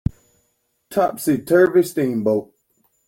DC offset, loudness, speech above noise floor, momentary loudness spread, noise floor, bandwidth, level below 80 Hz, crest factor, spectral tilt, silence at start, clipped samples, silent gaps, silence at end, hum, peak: under 0.1%; -19 LUFS; 51 dB; 10 LU; -68 dBFS; 17 kHz; -46 dBFS; 16 dB; -6.5 dB/octave; 0.9 s; under 0.1%; none; 0.65 s; none; -4 dBFS